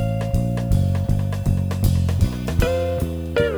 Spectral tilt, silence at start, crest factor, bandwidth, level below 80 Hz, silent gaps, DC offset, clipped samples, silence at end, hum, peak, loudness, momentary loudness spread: -7.5 dB/octave; 0 s; 14 dB; over 20 kHz; -28 dBFS; none; under 0.1%; under 0.1%; 0 s; none; -6 dBFS; -21 LUFS; 2 LU